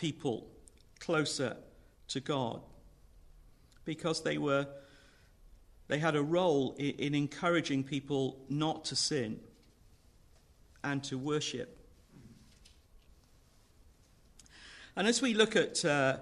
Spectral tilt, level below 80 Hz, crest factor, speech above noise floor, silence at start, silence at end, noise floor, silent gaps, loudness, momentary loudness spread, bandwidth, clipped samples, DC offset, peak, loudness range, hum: -4.5 dB/octave; -64 dBFS; 22 dB; 31 dB; 0 s; 0 s; -64 dBFS; none; -33 LUFS; 15 LU; 12 kHz; under 0.1%; under 0.1%; -14 dBFS; 8 LU; none